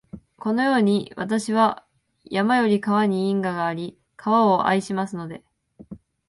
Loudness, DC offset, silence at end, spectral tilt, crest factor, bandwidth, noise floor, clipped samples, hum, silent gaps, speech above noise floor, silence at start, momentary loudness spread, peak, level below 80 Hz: -22 LUFS; under 0.1%; 0.3 s; -6 dB/octave; 16 dB; 11.5 kHz; -44 dBFS; under 0.1%; none; none; 23 dB; 0.15 s; 14 LU; -6 dBFS; -62 dBFS